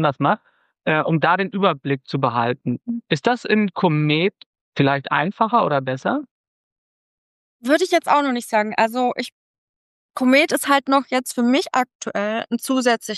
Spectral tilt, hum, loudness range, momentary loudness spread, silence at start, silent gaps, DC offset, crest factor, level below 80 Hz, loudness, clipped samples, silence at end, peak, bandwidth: -5 dB/octave; none; 2 LU; 8 LU; 0 s; 4.46-4.53 s, 4.61-4.72 s, 6.31-7.60 s, 9.32-10.09 s, 11.95-11.99 s; under 0.1%; 16 dB; -70 dBFS; -20 LUFS; under 0.1%; 0 s; -4 dBFS; 12.5 kHz